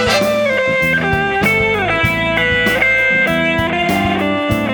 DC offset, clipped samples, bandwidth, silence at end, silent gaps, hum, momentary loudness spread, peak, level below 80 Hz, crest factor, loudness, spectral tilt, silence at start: under 0.1%; under 0.1%; over 20 kHz; 0 s; none; none; 4 LU; 0 dBFS; -36 dBFS; 14 dB; -13 LUFS; -5 dB/octave; 0 s